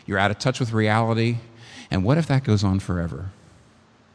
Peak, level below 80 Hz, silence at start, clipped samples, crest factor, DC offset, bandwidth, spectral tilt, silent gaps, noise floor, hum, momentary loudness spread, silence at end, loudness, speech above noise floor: -2 dBFS; -48 dBFS; 0.1 s; under 0.1%; 20 dB; under 0.1%; 11 kHz; -6.5 dB/octave; none; -55 dBFS; none; 15 LU; 0.85 s; -22 LUFS; 33 dB